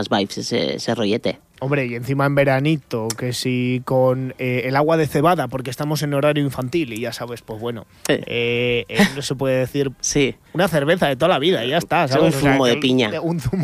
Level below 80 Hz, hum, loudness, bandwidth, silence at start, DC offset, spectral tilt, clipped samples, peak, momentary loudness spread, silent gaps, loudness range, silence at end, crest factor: -48 dBFS; none; -19 LUFS; 15.5 kHz; 0 s; under 0.1%; -5 dB/octave; under 0.1%; -4 dBFS; 9 LU; none; 4 LU; 0 s; 16 dB